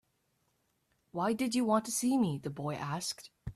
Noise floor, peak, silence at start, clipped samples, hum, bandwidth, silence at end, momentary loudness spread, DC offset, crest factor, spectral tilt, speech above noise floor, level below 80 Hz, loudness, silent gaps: -77 dBFS; -18 dBFS; 1.15 s; under 0.1%; none; 14.5 kHz; 0.05 s; 9 LU; under 0.1%; 18 dB; -4.5 dB/octave; 44 dB; -64 dBFS; -33 LUFS; none